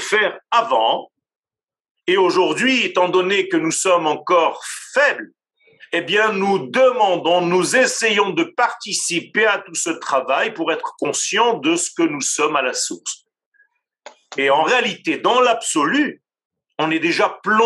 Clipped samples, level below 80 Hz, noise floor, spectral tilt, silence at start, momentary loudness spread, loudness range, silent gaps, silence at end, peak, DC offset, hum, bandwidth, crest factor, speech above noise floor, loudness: under 0.1%; -84 dBFS; under -90 dBFS; -2.5 dB/octave; 0 s; 7 LU; 3 LU; 1.36-1.43 s, 1.91-1.95 s, 13.46-13.52 s, 16.45-16.50 s; 0 s; -2 dBFS; under 0.1%; none; 12.5 kHz; 16 dB; over 72 dB; -18 LUFS